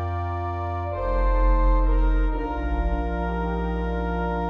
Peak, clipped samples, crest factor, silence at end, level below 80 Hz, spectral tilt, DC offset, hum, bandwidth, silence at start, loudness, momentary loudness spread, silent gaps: -10 dBFS; under 0.1%; 12 dB; 0 s; -24 dBFS; -9.5 dB/octave; under 0.1%; none; 4.4 kHz; 0 s; -26 LUFS; 6 LU; none